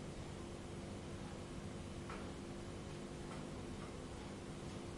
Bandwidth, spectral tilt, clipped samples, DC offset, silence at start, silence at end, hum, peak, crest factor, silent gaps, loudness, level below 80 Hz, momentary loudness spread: 11.5 kHz; -5.5 dB/octave; under 0.1%; under 0.1%; 0 s; 0 s; 50 Hz at -60 dBFS; -36 dBFS; 12 dB; none; -49 LUFS; -58 dBFS; 1 LU